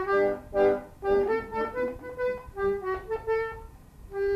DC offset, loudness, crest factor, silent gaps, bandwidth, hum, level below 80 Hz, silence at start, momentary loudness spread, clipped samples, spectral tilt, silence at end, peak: under 0.1%; -29 LUFS; 16 dB; none; 13.5 kHz; none; -48 dBFS; 0 s; 8 LU; under 0.1%; -7 dB/octave; 0 s; -12 dBFS